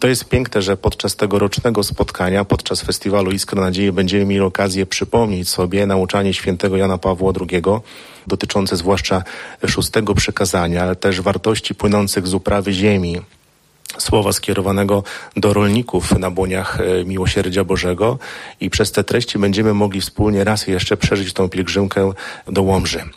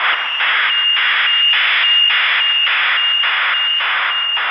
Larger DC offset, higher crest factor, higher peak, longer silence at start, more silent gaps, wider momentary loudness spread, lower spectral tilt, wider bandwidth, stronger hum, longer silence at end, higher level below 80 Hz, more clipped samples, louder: neither; about the same, 14 dB vs 12 dB; about the same, -4 dBFS vs -4 dBFS; about the same, 0 s vs 0 s; neither; about the same, 4 LU vs 5 LU; first, -5 dB/octave vs 1.5 dB/octave; first, 15.5 kHz vs 6 kHz; neither; about the same, 0.05 s vs 0 s; first, -36 dBFS vs -76 dBFS; neither; second, -17 LUFS vs -12 LUFS